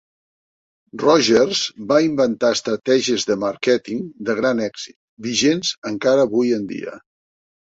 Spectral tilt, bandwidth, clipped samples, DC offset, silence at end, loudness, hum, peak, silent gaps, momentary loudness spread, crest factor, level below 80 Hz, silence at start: -3.5 dB/octave; 8 kHz; under 0.1%; under 0.1%; 0.75 s; -19 LUFS; none; -2 dBFS; 4.96-5.17 s, 5.78-5.82 s; 13 LU; 18 dB; -62 dBFS; 0.95 s